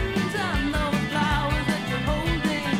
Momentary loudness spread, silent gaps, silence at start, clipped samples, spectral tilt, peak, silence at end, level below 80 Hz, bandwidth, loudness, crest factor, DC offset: 2 LU; none; 0 s; under 0.1%; -5.5 dB/octave; -12 dBFS; 0 s; -34 dBFS; 16 kHz; -25 LUFS; 14 dB; under 0.1%